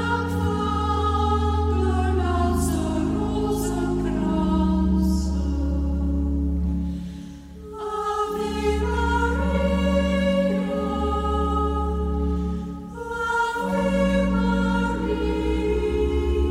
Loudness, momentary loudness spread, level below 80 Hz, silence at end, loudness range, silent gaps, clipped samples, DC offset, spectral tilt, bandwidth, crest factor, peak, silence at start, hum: -23 LUFS; 7 LU; -28 dBFS; 0 s; 3 LU; none; under 0.1%; under 0.1%; -7 dB/octave; 15 kHz; 12 dB; -10 dBFS; 0 s; none